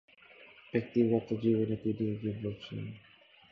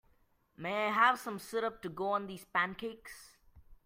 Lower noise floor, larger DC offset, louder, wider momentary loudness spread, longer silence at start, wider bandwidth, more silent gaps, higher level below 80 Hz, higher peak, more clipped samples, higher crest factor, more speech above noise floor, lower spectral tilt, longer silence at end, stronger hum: second, -57 dBFS vs -71 dBFS; neither; about the same, -33 LUFS vs -34 LUFS; about the same, 19 LU vs 17 LU; second, 0.4 s vs 0.6 s; second, 6.2 kHz vs 16 kHz; neither; about the same, -64 dBFS vs -68 dBFS; about the same, -16 dBFS vs -14 dBFS; neither; about the same, 18 dB vs 22 dB; second, 25 dB vs 36 dB; first, -9.5 dB/octave vs -4 dB/octave; first, 0.5 s vs 0.1 s; neither